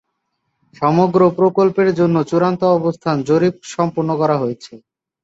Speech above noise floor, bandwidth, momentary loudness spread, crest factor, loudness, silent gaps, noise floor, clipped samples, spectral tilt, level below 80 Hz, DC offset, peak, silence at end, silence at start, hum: 56 dB; 8 kHz; 7 LU; 14 dB; -16 LUFS; none; -72 dBFS; under 0.1%; -7.5 dB/octave; -58 dBFS; under 0.1%; -2 dBFS; 0.45 s; 0.8 s; none